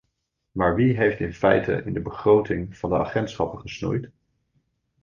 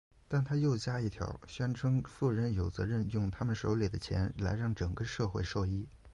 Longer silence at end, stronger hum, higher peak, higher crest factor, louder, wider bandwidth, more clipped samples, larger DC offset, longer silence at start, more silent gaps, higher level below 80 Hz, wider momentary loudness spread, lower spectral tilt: first, 0.95 s vs 0 s; neither; first, -4 dBFS vs -20 dBFS; first, 20 dB vs 14 dB; first, -23 LUFS vs -35 LUFS; second, 7.2 kHz vs 10.5 kHz; neither; neither; first, 0.55 s vs 0.3 s; neither; about the same, -46 dBFS vs -48 dBFS; first, 10 LU vs 5 LU; about the same, -7.5 dB/octave vs -7 dB/octave